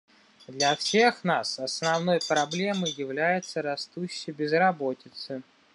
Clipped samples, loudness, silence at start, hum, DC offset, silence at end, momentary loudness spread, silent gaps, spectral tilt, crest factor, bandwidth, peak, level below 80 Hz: under 0.1%; -26 LUFS; 0.5 s; none; under 0.1%; 0.35 s; 14 LU; none; -3.5 dB/octave; 20 dB; 11.5 kHz; -8 dBFS; -78 dBFS